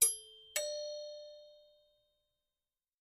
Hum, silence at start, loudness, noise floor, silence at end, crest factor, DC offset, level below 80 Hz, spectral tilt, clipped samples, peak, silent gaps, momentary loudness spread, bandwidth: 60 Hz at -95 dBFS; 0 s; -38 LUFS; under -90 dBFS; 1.45 s; 28 dB; under 0.1%; -82 dBFS; 3 dB/octave; under 0.1%; -12 dBFS; none; 18 LU; 14.5 kHz